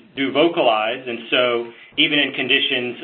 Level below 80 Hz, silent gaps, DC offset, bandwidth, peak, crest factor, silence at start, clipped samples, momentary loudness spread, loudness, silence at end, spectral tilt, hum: -66 dBFS; none; under 0.1%; 4.4 kHz; -2 dBFS; 18 dB; 0.15 s; under 0.1%; 8 LU; -18 LUFS; 0 s; -9 dB/octave; none